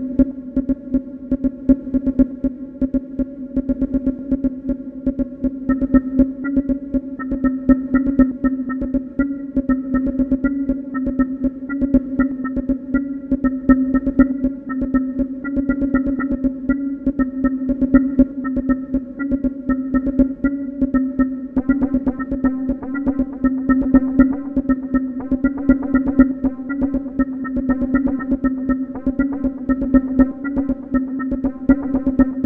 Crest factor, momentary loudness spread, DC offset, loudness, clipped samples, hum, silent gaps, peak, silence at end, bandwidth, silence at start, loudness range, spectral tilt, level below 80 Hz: 18 dB; 7 LU; under 0.1%; -20 LUFS; under 0.1%; none; none; 0 dBFS; 0 s; 2.3 kHz; 0 s; 2 LU; -11.5 dB/octave; -34 dBFS